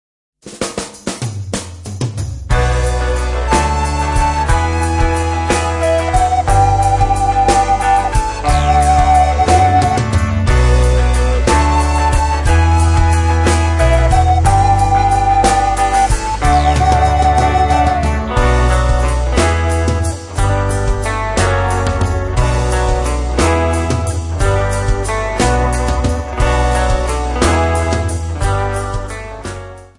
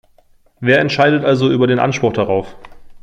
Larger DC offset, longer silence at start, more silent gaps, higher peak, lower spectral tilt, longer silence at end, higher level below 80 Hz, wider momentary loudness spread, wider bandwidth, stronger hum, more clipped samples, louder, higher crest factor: neither; second, 0.45 s vs 0.6 s; neither; about the same, 0 dBFS vs -2 dBFS; about the same, -5.5 dB/octave vs -6.5 dB/octave; about the same, 0.15 s vs 0.05 s; first, -18 dBFS vs -48 dBFS; about the same, 8 LU vs 8 LU; first, 11.5 kHz vs 9 kHz; neither; neither; about the same, -14 LUFS vs -14 LUFS; about the same, 12 dB vs 14 dB